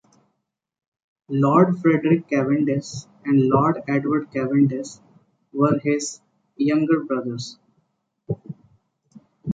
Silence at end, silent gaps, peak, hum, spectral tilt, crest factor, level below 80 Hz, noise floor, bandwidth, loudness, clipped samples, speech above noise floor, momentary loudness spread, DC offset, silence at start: 0 s; none; -4 dBFS; none; -7 dB/octave; 18 dB; -62 dBFS; -77 dBFS; 9.2 kHz; -21 LUFS; under 0.1%; 57 dB; 17 LU; under 0.1%; 1.3 s